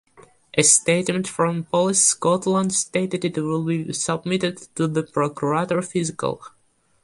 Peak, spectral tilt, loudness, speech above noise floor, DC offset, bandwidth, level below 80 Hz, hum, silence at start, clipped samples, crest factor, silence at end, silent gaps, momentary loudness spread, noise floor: -2 dBFS; -3.5 dB/octave; -21 LUFS; 28 dB; under 0.1%; 11.5 kHz; -62 dBFS; none; 0.55 s; under 0.1%; 20 dB; 0.55 s; none; 9 LU; -50 dBFS